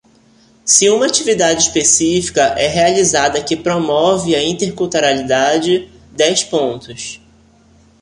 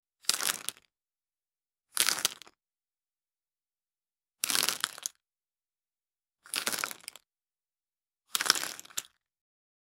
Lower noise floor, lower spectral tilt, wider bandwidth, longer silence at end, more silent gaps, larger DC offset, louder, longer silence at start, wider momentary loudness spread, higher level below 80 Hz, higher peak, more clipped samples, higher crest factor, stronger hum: second, -49 dBFS vs under -90 dBFS; first, -2.5 dB/octave vs 1.5 dB/octave; second, 11.5 kHz vs 16.5 kHz; about the same, 0.85 s vs 0.95 s; neither; neither; first, -13 LUFS vs -31 LUFS; first, 0.65 s vs 0.25 s; second, 9 LU vs 13 LU; first, -46 dBFS vs -80 dBFS; about the same, 0 dBFS vs 0 dBFS; neither; second, 14 dB vs 38 dB; neither